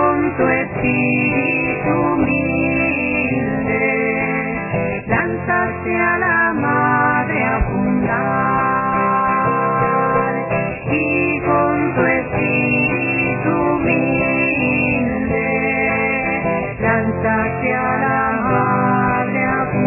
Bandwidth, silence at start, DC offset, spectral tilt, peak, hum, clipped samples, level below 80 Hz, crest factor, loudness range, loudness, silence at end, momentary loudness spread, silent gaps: 3 kHz; 0 s; under 0.1%; -11 dB/octave; -2 dBFS; none; under 0.1%; -36 dBFS; 14 dB; 1 LU; -17 LUFS; 0 s; 3 LU; none